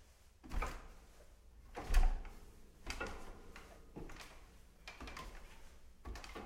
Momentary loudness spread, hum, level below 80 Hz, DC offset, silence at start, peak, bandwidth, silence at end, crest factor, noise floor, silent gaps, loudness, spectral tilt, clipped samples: 23 LU; none; -42 dBFS; under 0.1%; 0 s; -18 dBFS; 14.5 kHz; 0 s; 24 dB; -60 dBFS; none; -47 LUFS; -4.5 dB/octave; under 0.1%